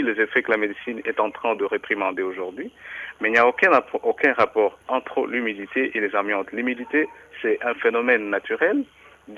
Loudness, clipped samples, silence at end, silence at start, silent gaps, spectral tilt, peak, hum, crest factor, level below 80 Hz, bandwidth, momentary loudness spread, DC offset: -22 LUFS; under 0.1%; 0 s; 0 s; none; -5.5 dB/octave; -4 dBFS; none; 18 dB; -66 dBFS; 11 kHz; 11 LU; under 0.1%